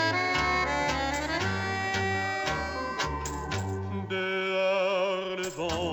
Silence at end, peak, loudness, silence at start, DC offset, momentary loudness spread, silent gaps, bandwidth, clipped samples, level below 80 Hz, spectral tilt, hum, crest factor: 0 s; -14 dBFS; -29 LUFS; 0 s; under 0.1%; 7 LU; none; over 20 kHz; under 0.1%; -46 dBFS; -4 dB/octave; none; 14 dB